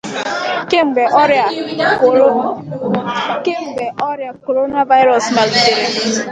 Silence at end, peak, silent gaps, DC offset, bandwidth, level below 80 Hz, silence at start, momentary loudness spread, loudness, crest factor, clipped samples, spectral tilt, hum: 0 s; 0 dBFS; none; under 0.1%; 9.4 kHz; -58 dBFS; 0.05 s; 10 LU; -14 LUFS; 14 dB; under 0.1%; -3.5 dB/octave; none